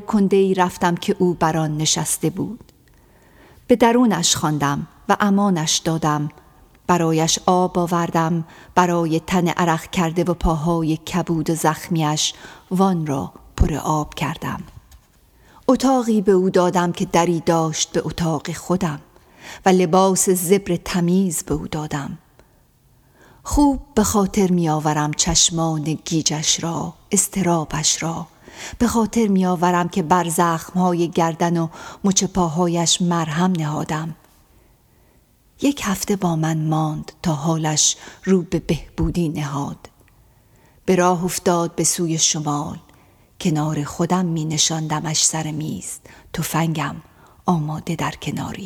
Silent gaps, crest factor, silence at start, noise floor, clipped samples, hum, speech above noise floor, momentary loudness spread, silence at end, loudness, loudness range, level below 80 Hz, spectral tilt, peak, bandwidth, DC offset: none; 20 dB; 0 s; -56 dBFS; under 0.1%; none; 36 dB; 10 LU; 0 s; -19 LUFS; 4 LU; -38 dBFS; -4.5 dB/octave; 0 dBFS; 17.5 kHz; under 0.1%